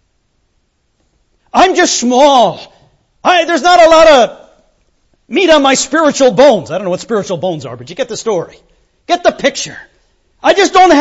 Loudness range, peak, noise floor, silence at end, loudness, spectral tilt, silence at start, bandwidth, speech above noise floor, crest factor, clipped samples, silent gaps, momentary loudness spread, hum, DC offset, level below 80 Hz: 8 LU; 0 dBFS; -60 dBFS; 0 s; -10 LUFS; -3 dB/octave; 1.55 s; 8.2 kHz; 51 dB; 12 dB; 0.3%; none; 13 LU; none; under 0.1%; -44 dBFS